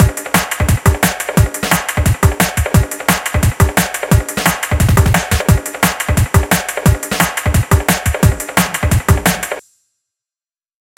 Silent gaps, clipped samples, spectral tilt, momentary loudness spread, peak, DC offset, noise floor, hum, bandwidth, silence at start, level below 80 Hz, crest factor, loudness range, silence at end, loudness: none; 0.1%; -4.5 dB/octave; 3 LU; 0 dBFS; under 0.1%; under -90 dBFS; none; 17.5 kHz; 0 s; -22 dBFS; 14 dB; 1 LU; 1.4 s; -14 LUFS